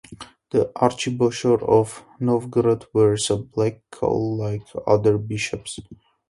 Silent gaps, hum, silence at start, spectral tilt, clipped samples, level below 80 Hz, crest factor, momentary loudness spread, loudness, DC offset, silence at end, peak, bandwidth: none; none; 0.1 s; -6 dB/octave; under 0.1%; -52 dBFS; 20 dB; 10 LU; -22 LUFS; under 0.1%; 0.35 s; -2 dBFS; 11.5 kHz